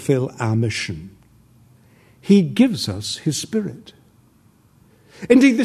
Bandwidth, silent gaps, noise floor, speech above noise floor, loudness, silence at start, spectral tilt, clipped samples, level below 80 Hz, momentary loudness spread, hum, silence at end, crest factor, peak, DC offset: 13.5 kHz; none; -55 dBFS; 37 dB; -19 LUFS; 0 s; -5.5 dB/octave; under 0.1%; -56 dBFS; 20 LU; none; 0 s; 20 dB; 0 dBFS; under 0.1%